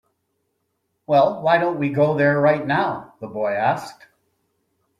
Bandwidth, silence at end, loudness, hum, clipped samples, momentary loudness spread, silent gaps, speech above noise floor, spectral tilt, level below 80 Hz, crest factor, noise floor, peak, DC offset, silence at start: 11.5 kHz; 1.05 s; -19 LUFS; none; under 0.1%; 11 LU; none; 54 dB; -7.5 dB/octave; -62 dBFS; 18 dB; -73 dBFS; -4 dBFS; under 0.1%; 1.1 s